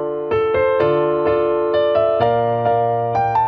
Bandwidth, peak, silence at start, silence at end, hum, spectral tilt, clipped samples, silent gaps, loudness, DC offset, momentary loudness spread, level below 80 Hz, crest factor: 5.8 kHz; -4 dBFS; 0 s; 0 s; none; -8.5 dB/octave; under 0.1%; none; -17 LUFS; under 0.1%; 2 LU; -46 dBFS; 12 dB